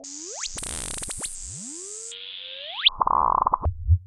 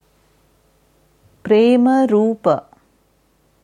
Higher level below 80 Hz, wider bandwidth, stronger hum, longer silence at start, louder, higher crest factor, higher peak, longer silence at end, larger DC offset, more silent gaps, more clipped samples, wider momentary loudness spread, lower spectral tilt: first, -36 dBFS vs -62 dBFS; first, 13.5 kHz vs 10 kHz; neither; second, 0 s vs 1.45 s; second, -26 LUFS vs -15 LUFS; about the same, 20 dB vs 16 dB; second, -6 dBFS vs -2 dBFS; second, 0 s vs 1.05 s; neither; neither; neither; first, 14 LU vs 9 LU; second, -2.5 dB/octave vs -7.5 dB/octave